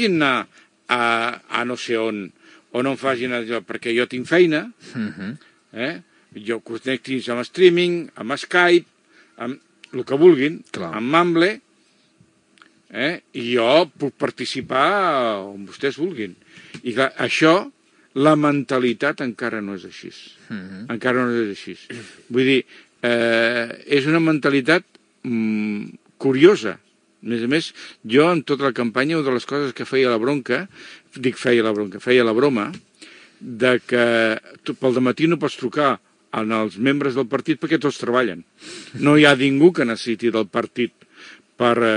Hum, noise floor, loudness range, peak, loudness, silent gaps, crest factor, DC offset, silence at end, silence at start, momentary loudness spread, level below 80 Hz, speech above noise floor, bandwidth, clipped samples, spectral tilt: none; -59 dBFS; 5 LU; 0 dBFS; -19 LUFS; none; 20 dB; under 0.1%; 0 s; 0 s; 18 LU; -74 dBFS; 40 dB; 10.5 kHz; under 0.1%; -5.5 dB/octave